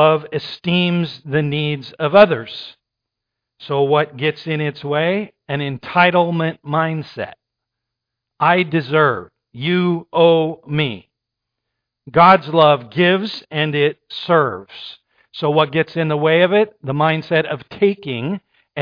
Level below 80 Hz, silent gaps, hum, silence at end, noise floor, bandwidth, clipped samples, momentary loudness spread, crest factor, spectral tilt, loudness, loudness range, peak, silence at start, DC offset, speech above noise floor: -60 dBFS; none; none; 0 s; -81 dBFS; 5.2 kHz; under 0.1%; 13 LU; 18 dB; -8.5 dB/octave; -17 LUFS; 4 LU; 0 dBFS; 0 s; under 0.1%; 65 dB